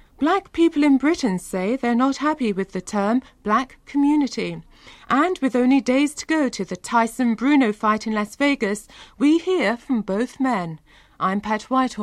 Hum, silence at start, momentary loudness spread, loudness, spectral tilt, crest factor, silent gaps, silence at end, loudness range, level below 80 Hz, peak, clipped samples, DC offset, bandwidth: none; 0.2 s; 8 LU; -21 LUFS; -5 dB/octave; 14 dB; none; 0 s; 2 LU; -54 dBFS; -6 dBFS; under 0.1%; under 0.1%; 13.5 kHz